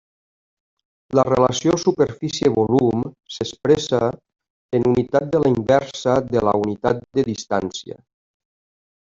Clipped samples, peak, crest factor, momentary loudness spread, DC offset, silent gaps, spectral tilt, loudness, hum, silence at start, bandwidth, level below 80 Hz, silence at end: under 0.1%; -2 dBFS; 20 dB; 8 LU; under 0.1%; 4.50-4.69 s; -6 dB/octave; -20 LUFS; none; 1.1 s; 7.6 kHz; -50 dBFS; 1.2 s